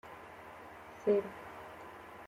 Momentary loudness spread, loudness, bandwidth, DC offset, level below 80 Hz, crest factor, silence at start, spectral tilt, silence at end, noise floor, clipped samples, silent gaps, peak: 18 LU; -36 LUFS; 15.5 kHz; under 0.1%; -72 dBFS; 20 dB; 0.05 s; -6.5 dB/octave; 0 s; -51 dBFS; under 0.1%; none; -20 dBFS